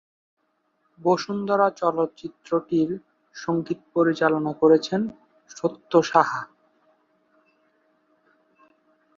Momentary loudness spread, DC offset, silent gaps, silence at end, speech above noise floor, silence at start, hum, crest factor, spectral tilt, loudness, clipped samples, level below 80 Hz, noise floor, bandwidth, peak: 14 LU; under 0.1%; none; 2.7 s; 48 dB; 1 s; none; 24 dB; -6 dB/octave; -23 LUFS; under 0.1%; -70 dBFS; -70 dBFS; 7.4 kHz; -2 dBFS